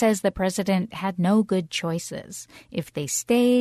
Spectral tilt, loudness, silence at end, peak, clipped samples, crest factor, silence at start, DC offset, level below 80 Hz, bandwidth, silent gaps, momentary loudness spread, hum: -5 dB/octave; -24 LUFS; 0 s; -8 dBFS; under 0.1%; 16 dB; 0 s; under 0.1%; -52 dBFS; 13.5 kHz; none; 13 LU; none